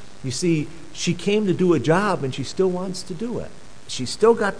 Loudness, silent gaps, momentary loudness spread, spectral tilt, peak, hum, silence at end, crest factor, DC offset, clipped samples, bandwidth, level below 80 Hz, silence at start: -22 LUFS; none; 11 LU; -5.5 dB/octave; -4 dBFS; none; 0 s; 18 dB; 2%; under 0.1%; 11 kHz; -52 dBFS; 0 s